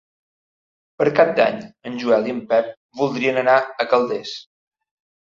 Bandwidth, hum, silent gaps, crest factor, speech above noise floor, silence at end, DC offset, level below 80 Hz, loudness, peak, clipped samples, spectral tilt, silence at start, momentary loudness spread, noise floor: 7.4 kHz; none; 2.77-2.89 s; 18 dB; over 71 dB; 0.95 s; under 0.1%; -68 dBFS; -19 LUFS; -2 dBFS; under 0.1%; -5.5 dB/octave; 1 s; 15 LU; under -90 dBFS